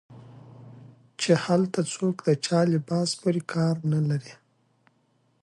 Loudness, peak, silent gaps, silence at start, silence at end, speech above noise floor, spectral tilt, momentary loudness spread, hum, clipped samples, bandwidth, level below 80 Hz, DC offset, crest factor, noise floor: -25 LUFS; -8 dBFS; none; 0.1 s; 1.1 s; 43 dB; -6 dB/octave; 6 LU; none; under 0.1%; 11.5 kHz; -68 dBFS; under 0.1%; 20 dB; -68 dBFS